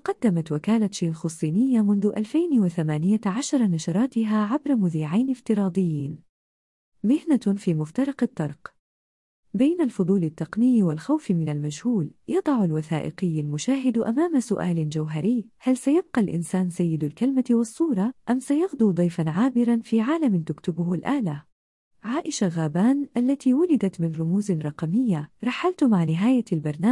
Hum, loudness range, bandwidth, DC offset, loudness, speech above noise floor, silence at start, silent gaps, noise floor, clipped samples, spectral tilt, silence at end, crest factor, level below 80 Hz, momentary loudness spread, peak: none; 3 LU; 12 kHz; under 0.1%; -24 LUFS; over 67 dB; 0.05 s; 6.29-6.92 s, 8.79-9.43 s, 21.52-21.91 s; under -90 dBFS; under 0.1%; -7 dB/octave; 0 s; 12 dB; -66 dBFS; 6 LU; -10 dBFS